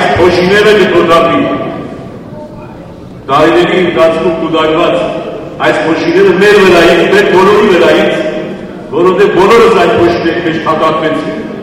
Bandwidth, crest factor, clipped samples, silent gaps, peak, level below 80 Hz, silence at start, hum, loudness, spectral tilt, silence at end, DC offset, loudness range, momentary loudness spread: 15.5 kHz; 8 dB; 2%; none; 0 dBFS; -36 dBFS; 0 s; none; -7 LUFS; -5.5 dB/octave; 0 s; under 0.1%; 4 LU; 19 LU